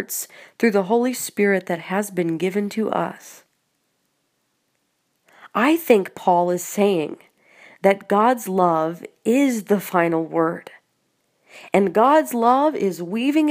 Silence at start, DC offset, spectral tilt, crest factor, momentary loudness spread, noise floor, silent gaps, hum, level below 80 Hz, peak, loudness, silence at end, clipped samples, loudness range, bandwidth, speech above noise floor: 0 s; under 0.1%; -5.5 dB/octave; 20 dB; 10 LU; -70 dBFS; none; none; -72 dBFS; -2 dBFS; -20 LUFS; 0 s; under 0.1%; 7 LU; 15.5 kHz; 51 dB